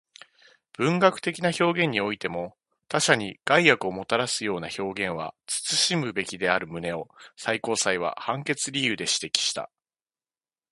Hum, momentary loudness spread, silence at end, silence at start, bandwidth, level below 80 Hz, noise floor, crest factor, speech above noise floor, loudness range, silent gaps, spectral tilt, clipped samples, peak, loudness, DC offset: none; 11 LU; 1.05 s; 0.8 s; 11.5 kHz; -64 dBFS; under -90 dBFS; 26 dB; over 64 dB; 3 LU; none; -3 dB/octave; under 0.1%; 0 dBFS; -25 LUFS; under 0.1%